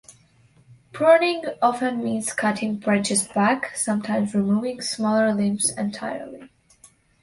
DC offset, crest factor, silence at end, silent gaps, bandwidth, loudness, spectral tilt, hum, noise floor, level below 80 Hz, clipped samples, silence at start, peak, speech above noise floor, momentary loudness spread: under 0.1%; 18 dB; 0.75 s; none; 11.5 kHz; -22 LUFS; -4 dB/octave; none; -57 dBFS; -64 dBFS; under 0.1%; 0.1 s; -4 dBFS; 35 dB; 10 LU